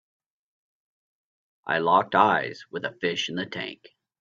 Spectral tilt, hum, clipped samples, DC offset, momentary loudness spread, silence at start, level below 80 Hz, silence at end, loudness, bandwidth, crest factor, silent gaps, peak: -4.5 dB/octave; none; under 0.1%; under 0.1%; 13 LU; 1.65 s; -70 dBFS; 0.45 s; -25 LUFS; 7.6 kHz; 24 dB; none; -4 dBFS